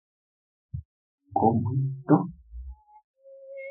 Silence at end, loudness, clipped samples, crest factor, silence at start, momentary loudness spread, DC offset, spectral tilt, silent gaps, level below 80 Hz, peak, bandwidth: 0 s; -26 LUFS; under 0.1%; 24 dB; 0.75 s; 21 LU; under 0.1%; -13 dB/octave; 0.85-1.18 s, 3.04-3.14 s; -50 dBFS; -6 dBFS; 2.8 kHz